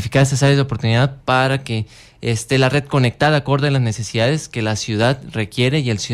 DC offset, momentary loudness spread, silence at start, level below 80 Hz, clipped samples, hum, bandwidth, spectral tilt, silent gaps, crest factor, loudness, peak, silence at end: under 0.1%; 8 LU; 0 s; -46 dBFS; under 0.1%; none; 13 kHz; -5.5 dB/octave; none; 14 dB; -17 LUFS; -2 dBFS; 0 s